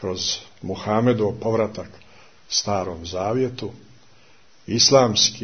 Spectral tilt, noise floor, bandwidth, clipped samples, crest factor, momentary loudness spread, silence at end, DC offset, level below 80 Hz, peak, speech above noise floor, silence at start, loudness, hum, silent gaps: -3.5 dB/octave; -55 dBFS; 6.6 kHz; under 0.1%; 20 dB; 17 LU; 0 s; 0.3%; -54 dBFS; -2 dBFS; 34 dB; 0 s; -21 LUFS; none; none